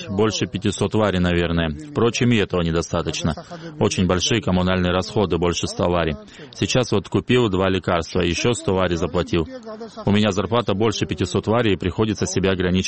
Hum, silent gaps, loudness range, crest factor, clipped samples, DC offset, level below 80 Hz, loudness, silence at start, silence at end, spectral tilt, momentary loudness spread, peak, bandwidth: none; none; 1 LU; 16 dB; under 0.1%; 0.3%; -40 dBFS; -21 LUFS; 0 s; 0 s; -5 dB/octave; 6 LU; -4 dBFS; 8.8 kHz